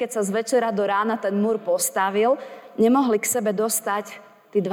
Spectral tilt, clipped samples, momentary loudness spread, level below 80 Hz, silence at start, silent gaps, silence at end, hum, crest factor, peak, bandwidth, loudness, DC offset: -4 dB/octave; under 0.1%; 8 LU; -74 dBFS; 0 s; none; 0 s; none; 14 dB; -8 dBFS; over 20 kHz; -22 LUFS; under 0.1%